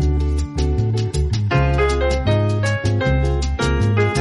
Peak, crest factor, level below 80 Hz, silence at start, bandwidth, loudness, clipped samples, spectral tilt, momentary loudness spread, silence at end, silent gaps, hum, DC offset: -4 dBFS; 12 dB; -22 dBFS; 0 s; 11.5 kHz; -19 LUFS; under 0.1%; -6.5 dB/octave; 3 LU; 0 s; none; none; under 0.1%